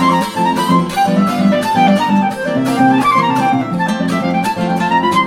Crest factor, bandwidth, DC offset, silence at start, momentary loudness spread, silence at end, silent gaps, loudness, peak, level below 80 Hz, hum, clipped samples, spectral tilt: 12 dB; 16.5 kHz; under 0.1%; 0 s; 5 LU; 0 s; none; -13 LUFS; 0 dBFS; -48 dBFS; none; under 0.1%; -6 dB/octave